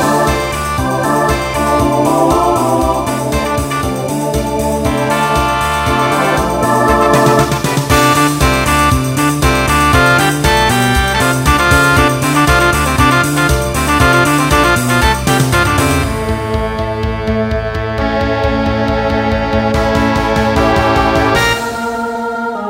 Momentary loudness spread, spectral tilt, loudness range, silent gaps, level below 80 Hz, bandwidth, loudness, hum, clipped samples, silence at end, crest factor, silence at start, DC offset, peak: 7 LU; -4.5 dB/octave; 4 LU; none; -24 dBFS; 16.5 kHz; -12 LUFS; none; under 0.1%; 0 s; 12 dB; 0 s; under 0.1%; 0 dBFS